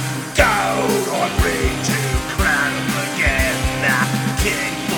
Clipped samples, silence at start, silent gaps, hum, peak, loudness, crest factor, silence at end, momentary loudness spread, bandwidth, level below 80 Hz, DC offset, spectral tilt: under 0.1%; 0 s; none; none; 0 dBFS; -18 LUFS; 18 dB; 0 s; 4 LU; over 20 kHz; -28 dBFS; under 0.1%; -4 dB/octave